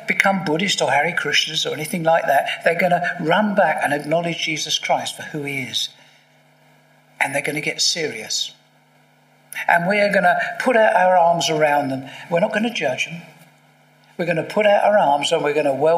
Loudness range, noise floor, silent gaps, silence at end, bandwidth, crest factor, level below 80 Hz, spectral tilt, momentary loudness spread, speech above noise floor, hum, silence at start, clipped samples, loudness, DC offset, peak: 6 LU; -55 dBFS; none; 0 s; 15.5 kHz; 20 dB; -72 dBFS; -3.5 dB/octave; 10 LU; 37 dB; none; 0 s; under 0.1%; -19 LUFS; under 0.1%; 0 dBFS